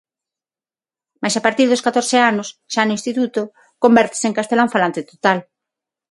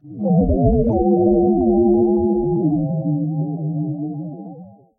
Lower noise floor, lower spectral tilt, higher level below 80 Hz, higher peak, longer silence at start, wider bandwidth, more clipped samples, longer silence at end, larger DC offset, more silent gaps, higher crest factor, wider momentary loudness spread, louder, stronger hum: first, under -90 dBFS vs -39 dBFS; second, -3.5 dB/octave vs -16.5 dB/octave; second, -64 dBFS vs -32 dBFS; first, 0 dBFS vs -4 dBFS; first, 1.2 s vs 0.05 s; first, 11.5 kHz vs 1.1 kHz; neither; first, 0.7 s vs 0.3 s; neither; neither; about the same, 18 dB vs 14 dB; second, 9 LU vs 12 LU; about the same, -17 LUFS vs -18 LUFS; neither